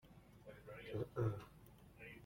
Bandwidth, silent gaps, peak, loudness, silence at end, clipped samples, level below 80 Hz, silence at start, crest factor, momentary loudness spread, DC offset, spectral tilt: 16.5 kHz; none; -28 dBFS; -46 LUFS; 0 s; under 0.1%; -68 dBFS; 0.05 s; 20 dB; 21 LU; under 0.1%; -8 dB/octave